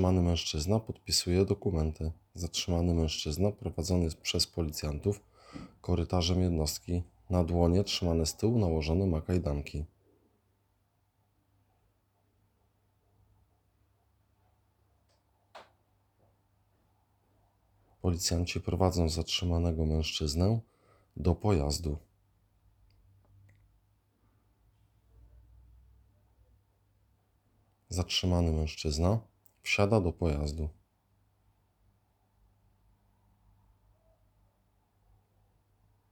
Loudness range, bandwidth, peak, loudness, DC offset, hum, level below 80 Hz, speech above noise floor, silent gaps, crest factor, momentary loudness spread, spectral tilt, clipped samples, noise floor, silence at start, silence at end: 9 LU; 17 kHz; -10 dBFS; -31 LUFS; under 0.1%; none; -46 dBFS; 44 dB; none; 22 dB; 11 LU; -5.5 dB/octave; under 0.1%; -74 dBFS; 0 s; 5.4 s